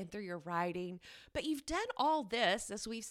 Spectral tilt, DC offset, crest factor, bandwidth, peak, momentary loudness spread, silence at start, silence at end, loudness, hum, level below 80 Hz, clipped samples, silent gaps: -3.5 dB/octave; under 0.1%; 18 dB; 16 kHz; -18 dBFS; 11 LU; 0 s; 0 s; -37 LUFS; none; -62 dBFS; under 0.1%; none